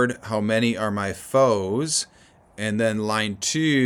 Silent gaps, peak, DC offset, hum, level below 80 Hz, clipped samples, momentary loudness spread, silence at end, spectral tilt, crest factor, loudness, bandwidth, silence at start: none; -6 dBFS; under 0.1%; none; -60 dBFS; under 0.1%; 7 LU; 0 s; -4 dB/octave; 16 dB; -23 LUFS; 19 kHz; 0 s